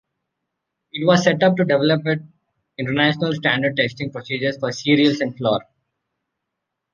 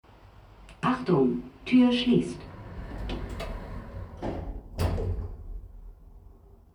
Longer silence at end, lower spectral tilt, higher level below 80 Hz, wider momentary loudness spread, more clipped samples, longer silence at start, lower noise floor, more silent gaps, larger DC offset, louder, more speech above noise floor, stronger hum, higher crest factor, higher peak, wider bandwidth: first, 1.3 s vs 0.45 s; second, -5.5 dB/octave vs -7 dB/octave; second, -62 dBFS vs -40 dBFS; second, 10 LU vs 20 LU; neither; first, 0.95 s vs 0.25 s; first, -80 dBFS vs -52 dBFS; neither; neither; first, -19 LUFS vs -28 LUFS; first, 61 dB vs 28 dB; neither; about the same, 20 dB vs 18 dB; first, -2 dBFS vs -10 dBFS; second, 7.4 kHz vs 11 kHz